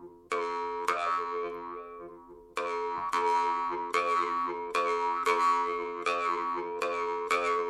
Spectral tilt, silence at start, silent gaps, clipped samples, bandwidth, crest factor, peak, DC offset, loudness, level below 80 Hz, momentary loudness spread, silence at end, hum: -2.5 dB/octave; 0 s; none; under 0.1%; 13 kHz; 18 dB; -12 dBFS; under 0.1%; -30 LUFS; -68 dBFS; 10 LU; 0 s; none